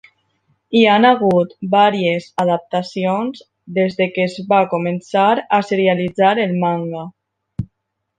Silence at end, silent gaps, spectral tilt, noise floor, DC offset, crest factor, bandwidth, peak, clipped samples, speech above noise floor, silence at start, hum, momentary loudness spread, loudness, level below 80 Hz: 0.55 s; none; -7 dB/octave; -74 dBFS; under 0.1%; 16 dB; 9.4 kHz; 0 dBFS; under 0.1%; 58 dB; 0.7 s; none; 14 LU; -16 LUFS; -56 dBFS